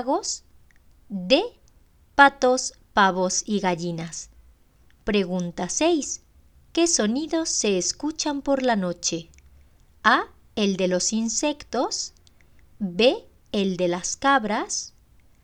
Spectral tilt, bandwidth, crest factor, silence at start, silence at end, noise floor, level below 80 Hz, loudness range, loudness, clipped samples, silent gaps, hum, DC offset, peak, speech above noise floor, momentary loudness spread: -3 dB/octave; 10.5 kHz; 24 dB; 0 s; 0.55 s; -56 dBFS; -54 dBFS; 3 LU; -23 LUFS; under 0.1%; none; none; under 0.1%; -2 dBFS; 34 dB; 13 LU